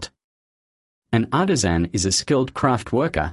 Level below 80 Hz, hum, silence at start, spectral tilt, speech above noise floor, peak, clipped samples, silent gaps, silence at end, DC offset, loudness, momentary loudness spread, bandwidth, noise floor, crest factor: -38 dBFS; none; 0 s; -4.5 dB/octave; over 70 dB; -2 dBFS; under 0.1%; 0.24-1.02 s; 0 s; under 0.1%; -21 LUFS; 4 LU; 11.5 kHz; under -90 dBFS; 18 dB